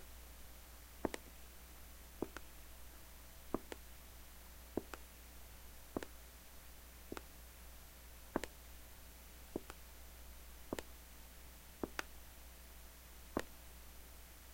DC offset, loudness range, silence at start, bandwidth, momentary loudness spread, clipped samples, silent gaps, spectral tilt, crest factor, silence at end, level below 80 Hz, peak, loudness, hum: under 0.1%; 2 LU; 0 s; 16.5 kHz; 11 LU; under 0.1%; none; -4 dB/octave; 34 dB; 0 s; -58 dBFS; -18 dBFS; -52 LUFS; none